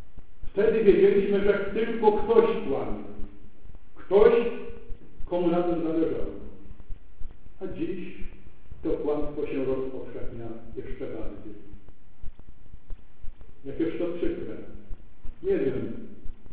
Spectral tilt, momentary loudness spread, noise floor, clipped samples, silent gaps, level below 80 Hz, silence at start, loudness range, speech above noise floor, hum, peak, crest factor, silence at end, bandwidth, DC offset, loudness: -10.5 dB/octave; 25 LU; -47 dBFS; under 0.1%; none; -44 dBFS; 0.15 s; 14 LU; 22 dB; none; -6 dBFS; 22 dB; 0 s; 4 kHz; 3%; -26 LUFS